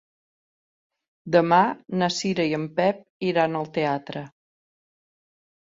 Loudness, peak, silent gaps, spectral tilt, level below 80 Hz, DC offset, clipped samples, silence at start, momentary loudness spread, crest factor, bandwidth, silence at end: -23 LUFS; -4 dBFS; 3.10-3.20 s; -5.5 dB/octave; -68 dBFS; under 0.1%; under 0.1%; 1.25 s; 11 LU; 22 dB; 7.8 kHz; 1.35 s